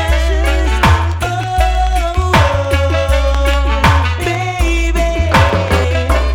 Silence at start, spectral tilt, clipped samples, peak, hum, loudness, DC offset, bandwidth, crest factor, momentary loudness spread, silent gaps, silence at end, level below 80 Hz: 0 s; -5.5 dB/octave; under 0.1%; -2 dBFS; none; -14 LUFS; under 0.1%; 16 kHz; 10 dB; 4 LU; none; 0 s; -16 dBFS